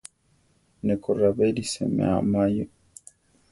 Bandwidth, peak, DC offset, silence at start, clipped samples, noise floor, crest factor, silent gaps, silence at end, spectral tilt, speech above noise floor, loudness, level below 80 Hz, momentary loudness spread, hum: 11.5 kHz; -10 dBFS; under 0.1%; 0.85 s; under 0.1%; -65 dBFS; 16 dB; none; 0.85 s; -6.5 dB/octave; 42 dB; -24 LUFS; -52 dBFS; 8 LU; none